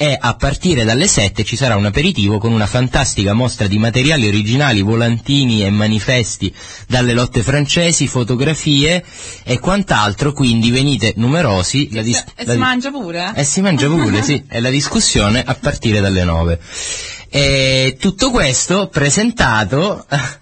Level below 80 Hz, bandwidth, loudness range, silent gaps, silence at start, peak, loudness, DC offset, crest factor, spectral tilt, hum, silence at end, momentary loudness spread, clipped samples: -32 dBFS; 8.8 kHz; 1 LU; none; 0 s; 0 dBFS; -14 LUFS; under 0.1%; 14 dB; -4.5 dB/octave; none; 0.05 s; 7 LU; under 0.1%